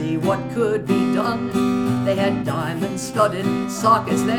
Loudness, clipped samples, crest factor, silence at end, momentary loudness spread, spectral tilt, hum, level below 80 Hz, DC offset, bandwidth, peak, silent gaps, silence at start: -20 LUFS; under 0.1%; 18 dB; 0 s; 6 LU; -6 dB/octave; none; -50 dBFS; under 0.1%; 17.5 kHz; -2 dBFS; none; 0 s